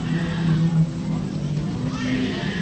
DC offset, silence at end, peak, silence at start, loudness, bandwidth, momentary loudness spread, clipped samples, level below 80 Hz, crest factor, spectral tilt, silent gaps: under 0.1%; 0 s; -10 dBFS; 0 s; -23 LUFS; 8.6 kHz; 6 LU; under 0.1%; -42 dBFS; 14 dB; -7 dB/octave; none